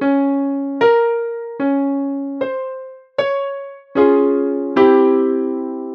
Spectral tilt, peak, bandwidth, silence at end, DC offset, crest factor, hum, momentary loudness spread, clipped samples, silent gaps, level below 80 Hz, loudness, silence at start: -7.5 dB/octave; 0 dBFS; 5.6 kHz; 0 s; under 0.1%; 16 dB; none; 13 LU; under 0.1%; none; -64 dBFS; -17 LUFS; 0 s